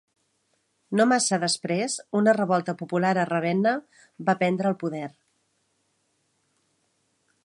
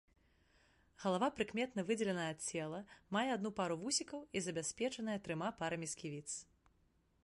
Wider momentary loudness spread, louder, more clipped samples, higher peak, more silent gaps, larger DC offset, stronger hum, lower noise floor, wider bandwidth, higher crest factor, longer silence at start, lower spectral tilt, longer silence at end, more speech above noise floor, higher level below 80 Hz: about the same, 9 LU vs 8 LU; first, -24 LUFS vs -40 LUFS; neither; first, -6 dBFS vs -24 dBFS; neither; neither; neither; about the same, -72 dBFS vs -75 dBFS; about the same, 11.5 kHz vs 11.5 kHz; about the same, 20 dB vs 18 dB; about the same, 0.9 s vs 1 s; about the same, -4.5 dB/octave vs -4 dB/octave; first, 2.35 s vs 0.85 s; first, 48 dB vs 35 dB; about the same, -76 dBFS vs -74 dBFS